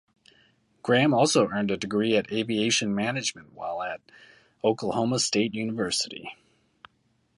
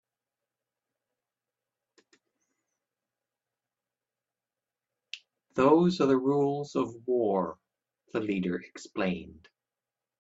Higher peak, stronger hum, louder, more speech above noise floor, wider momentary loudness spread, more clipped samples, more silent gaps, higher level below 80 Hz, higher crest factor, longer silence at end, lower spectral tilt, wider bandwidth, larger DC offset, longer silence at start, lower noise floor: about the same, -8 dBFS vs -10 dBFS; neither; about the same, -26 LUFS vs -28 LUFS; second, 44 dB vs over 62 dB; second, 13 LU vs 17 LU; neither; neither; first, -64 dBFS vs -70 dBFS; about the same, 20 dB vs 22 dB; first, 1.05 s vs 0.9 s; second, -4 dB/octave vs -7 dB/octave; first, 11.5 kHz vs 8 kHz; neither; second, 0.85 s vs 5.15 s; second, -69 dBFS vs under -90 dBFS